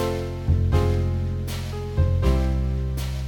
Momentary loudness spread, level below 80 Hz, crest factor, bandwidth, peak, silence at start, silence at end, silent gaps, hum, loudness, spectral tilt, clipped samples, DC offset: 7 LU; -26 dBFS; 14 dB; 17.5 kHz; -8 dBFS; 0 s; 0 s; none; none; -24 LUFS; -7.5 dB/octave; under 0.1%; under 0.1%